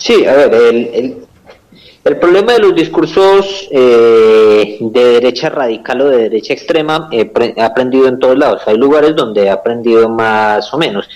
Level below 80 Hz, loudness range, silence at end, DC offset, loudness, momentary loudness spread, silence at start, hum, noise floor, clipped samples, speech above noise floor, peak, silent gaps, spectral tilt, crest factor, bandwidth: -48 dBFS; 3 LU; 0 s; under 0.1%; -9 LUFS; 8 LU; 0 s; none; -41 dBFS; under 0.1%; 32 dB; 0 dBFS; none; -5.5 dB/octave; 8 dB; 10.5 kHz